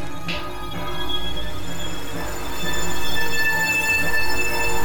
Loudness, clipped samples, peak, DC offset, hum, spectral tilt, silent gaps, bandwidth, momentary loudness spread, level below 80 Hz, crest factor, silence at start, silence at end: -23 LUFS; under 0.1%; -8 dBFS; 9%; none; -2.5 dB/octave; none; over 20 kHz; 12 LU; -38 dBFS; 14 dB; 0 s; 0 s